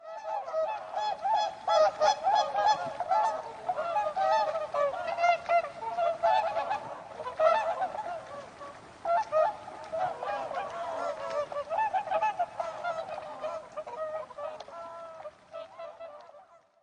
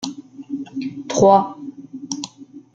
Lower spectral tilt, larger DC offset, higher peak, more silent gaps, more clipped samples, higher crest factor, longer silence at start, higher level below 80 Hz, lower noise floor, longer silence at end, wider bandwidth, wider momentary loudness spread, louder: second, -2.5 dB/octave vs -5 dB/octave; neither; second, -12 dBFS vs -2 dBFS; neither; neither; about the same, 20 dB vs 20 dB; about the same, 0 s vs 0 s; second, -72 dBFS vs -58 dBFS; first, -57 dBFS vs -39 dBFS; about the same, 0.25 s vs 0.15 s; first, 10 kHz vs 8.8 kHz; second, 17 LU vs 22 LU; second, -30 LUFS vs -19 LUFS